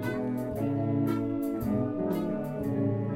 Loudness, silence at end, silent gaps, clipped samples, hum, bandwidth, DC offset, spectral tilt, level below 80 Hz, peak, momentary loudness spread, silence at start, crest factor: -30 LUFS; 0 s; none; under 0.1%; none; 16.5 kHz; under 0.1%; -9 dB/octave; -54 dBFS; -16 dBFS; 3 LU; 0 s; 14 dB